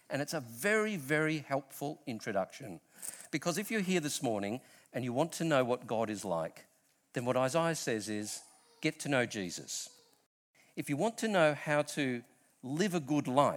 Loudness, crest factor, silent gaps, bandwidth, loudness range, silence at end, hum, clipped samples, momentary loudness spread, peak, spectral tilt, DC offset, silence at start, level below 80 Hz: -34 LUFS; 22 dB; 10.26-10.54 s; 19.5 kHz; 3 LU; 0 s; none; under 0.1%; 13 LU; -12 dBFS; -4.5 dB/octave; under 0.1%; 0.1 s; -78 dBFS